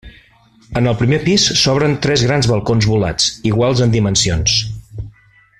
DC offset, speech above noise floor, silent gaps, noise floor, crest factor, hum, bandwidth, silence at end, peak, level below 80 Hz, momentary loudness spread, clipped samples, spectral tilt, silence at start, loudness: under 0.1%; 35 dB; none; -49 dBFS; 14 dB; none; 12 kHz; 0.5 s; -2 dBFS; -36 dBFS; 13 LU; under 0.1%; -4.5 dB/octave; 0.05 s; -14 LUFS